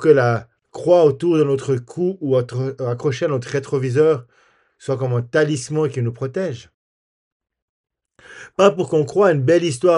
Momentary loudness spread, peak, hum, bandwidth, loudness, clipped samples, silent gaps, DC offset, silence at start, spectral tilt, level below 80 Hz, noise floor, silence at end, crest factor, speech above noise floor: 11 LU; 0 dBFS; none; 11 kHz; -19 LUFS; under 0.1%; 6.74-7.40 s, 7.62-7.84 s; under 0.1%; 0 s; -6.5 dB/octave; -62 dBFS; under -90 dBFS; 0 s; 18 dB; over 72 dB